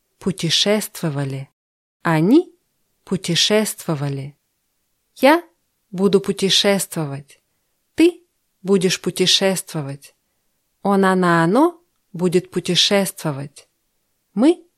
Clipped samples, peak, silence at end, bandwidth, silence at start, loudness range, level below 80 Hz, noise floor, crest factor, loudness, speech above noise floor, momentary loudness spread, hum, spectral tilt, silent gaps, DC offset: under 0.1%; -2 dBFS; 0.25 s; 15.5 kHz; 0.2 s; 2 LU; -62 dBFS; -70 dBFS; 18 dB; -18 LUFS; 52 dB; 16 LU; none; -4 dB/octave; 1.53-2.00 s; under 0.1%